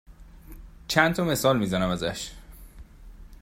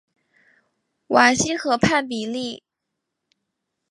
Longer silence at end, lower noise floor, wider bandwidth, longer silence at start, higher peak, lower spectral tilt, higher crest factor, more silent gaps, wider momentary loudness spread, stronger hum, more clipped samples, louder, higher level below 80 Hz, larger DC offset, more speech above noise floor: second, 0.05 s vs 1.35 s; second, -46 dBFS vs -81 dBFS; first, 16 kHz vs 11.5 kHz; second, 0.1 s vs 1.1 s; second, -4 dBFS vs 0 dBFS; about the same, -4.5 dB/octave vs -3.5 dB/octave; about the same, 24 dB vs 22 dB; neither; about the same, 15 LU vs 14 LU; neither; neither; second, -24 LUFS vs -20 LUFS; first, -46 dBFS vs -54 dBFS; neither; second, 22 dB vs 61 dB